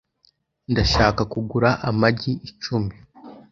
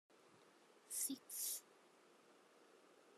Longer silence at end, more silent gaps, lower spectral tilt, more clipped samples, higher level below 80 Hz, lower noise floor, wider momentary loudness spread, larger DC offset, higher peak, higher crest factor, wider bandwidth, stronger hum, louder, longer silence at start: about the same, 0.1 s vs 0 s; neither; first, -6 dB/octave vs 0 dB/octave; neither; first, -36 dBFS vs under -90 dBFS; second, -63 dBFS vs -70 dBFS; second, 10 LU vs 25 LU; neither; first, -2 dBFS vs -30 dBFS; about the same, 22 dB vs 24 dB; second, 7.6 kHz vs 14.5 kHz; neither; first, -21 LUFS vs -45 LUFS; first, 0.7 s vs 0.1 s